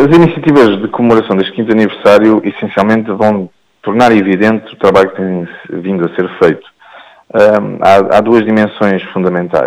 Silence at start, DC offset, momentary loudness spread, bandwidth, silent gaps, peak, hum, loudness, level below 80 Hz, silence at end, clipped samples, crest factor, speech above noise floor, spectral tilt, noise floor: 0 s; under 0.1%; 10 LU; 12 kHz; none; 0 dBFS; none; -10 LUFS; -44 dBFS; 0 s; 0.2%; 10 dB; 28 dB; -7.5 dB/octave; -37 dBFS